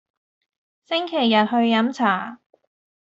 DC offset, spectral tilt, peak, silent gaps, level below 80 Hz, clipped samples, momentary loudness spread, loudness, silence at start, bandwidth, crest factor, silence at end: under 0.1%; -5.5 dB/octave; -4 dBFS; none; -70 dBFS; under 0.1%; 8 LU; -20 LUFS; 0.9 s; 7.6 kHz; 18 dB; 0.65 s